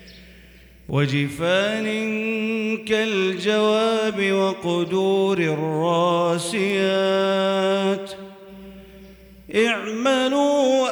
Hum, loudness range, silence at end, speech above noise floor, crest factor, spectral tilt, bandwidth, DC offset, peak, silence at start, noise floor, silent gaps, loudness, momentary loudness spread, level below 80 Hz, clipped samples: none; 3 LU; 0 s; 27 dB; 14 dB; -5 dB/octave; over 20 kHz; under 0.1%; -8 dBFS; 0 s; -47 dBFS; none; -21 LUFS; 6 LU; -56 dBFS; under 0.1%